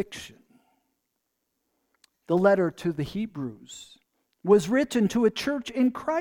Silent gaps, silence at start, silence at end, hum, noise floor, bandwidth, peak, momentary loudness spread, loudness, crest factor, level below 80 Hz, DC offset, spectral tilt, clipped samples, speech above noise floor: none; 0 s; 0 s; none; -79 dBFS; 18 kHz; -8 dBFS; 20 LU; -25 LUFS; 20 dB; -60 dBFS; under 0.1%; -6 dB/octave; under 0.1%; 55 dB